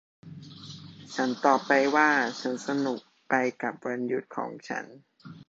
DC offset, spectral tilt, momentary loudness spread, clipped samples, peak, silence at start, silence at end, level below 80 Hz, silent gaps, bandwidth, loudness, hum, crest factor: under 0.1%; -4.5 dB/octave; 22 LU; under 0.1%; -6 dBFS; 0.25 s; 0.05 s; -74 dBFS; none; 8 kHz; -27 LUFS; none; 22 dB